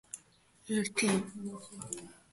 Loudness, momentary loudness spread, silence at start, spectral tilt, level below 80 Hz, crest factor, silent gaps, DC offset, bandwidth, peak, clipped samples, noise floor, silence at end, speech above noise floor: -34 LUFS; 16 LU; 0.15 s; -4 dB/octave; -72 dBFS; 20 dB; none; under 0.1%; 12 kHz; -18 dBFS; under 0.1%; -64 dBFS; 0.15 s; 29 dB